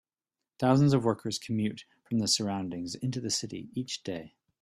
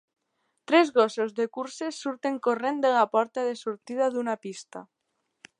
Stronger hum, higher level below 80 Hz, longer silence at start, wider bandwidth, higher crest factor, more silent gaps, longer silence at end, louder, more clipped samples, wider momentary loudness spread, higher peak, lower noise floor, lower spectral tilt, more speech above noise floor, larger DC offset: neither; first, -66 dBFS vs -84 dBFS; about the same, 0.6 s vs 0.7 s; first, 14 kHz vs 10.5 kHz; about the same, 18 dB vs 20 dB; neither; second, 0.35 s vs 0.75 s; second, -30 LUFS vs -26 LUFS; neither; about the same, 13 LU vs 12 LU; second, -12 dBFS vs -6 dBFS; first, under -90 dBFS vs -78 dBFS; about the same, -5 dB/octave vs -4 dB/octave; first, over 60 dB vs 52 dB; neither